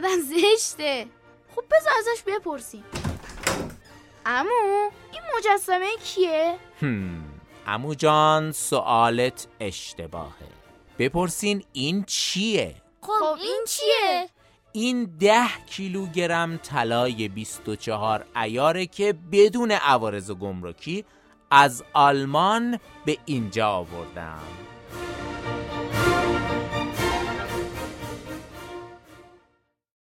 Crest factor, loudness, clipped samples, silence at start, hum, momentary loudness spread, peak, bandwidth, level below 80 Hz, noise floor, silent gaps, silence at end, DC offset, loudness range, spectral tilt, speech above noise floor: 24 dB; -24 LUFS; under 0.1%; 0 s; none; 17 LU; -2 dBFS; 16.5 kHz; -50 dBFS; -68 dBFS; none; 0.9 s; under 0.1%; 5 LU; -4 dB/octave; 45 dB